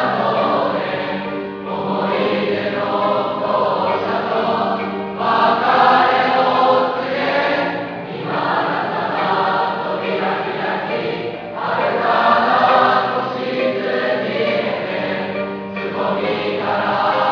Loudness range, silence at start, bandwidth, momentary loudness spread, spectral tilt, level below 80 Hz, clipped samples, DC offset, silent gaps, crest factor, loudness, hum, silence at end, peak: 4 LU; 0 s; 5.4 kHz; 10 LU; -6.5 dB/octave; -60 dBFS; under 0.1%; under 0.1%; none; 16 dB; -18 LUFS; none; 0 s; -2 dBFS